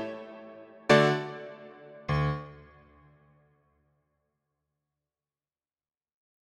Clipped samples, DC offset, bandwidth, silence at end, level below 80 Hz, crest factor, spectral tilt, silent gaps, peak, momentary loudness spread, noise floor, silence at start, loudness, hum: under 0.1%; under 0.1%; 11.5 kHz; 4 s; -54 dBFS; 26 dB; -6 dB/octave; none; -8 dBFS; 26 LU; under -90 dBFS; 0 s; -27 LUFS; none